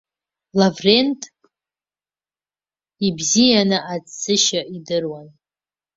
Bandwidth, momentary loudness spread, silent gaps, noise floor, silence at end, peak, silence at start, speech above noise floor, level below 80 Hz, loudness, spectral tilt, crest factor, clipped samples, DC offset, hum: 7.8 kHz; 16 LU; none; under -90 dBFS; 0.7 s; -2 dBFS; 0.55 s; over 72 dB; -60 dBFS; -18 LUFS; -3.5 dB/octave; 20 dB; under 0.1%; under 0.1%; 50 Hz at -45 dBFS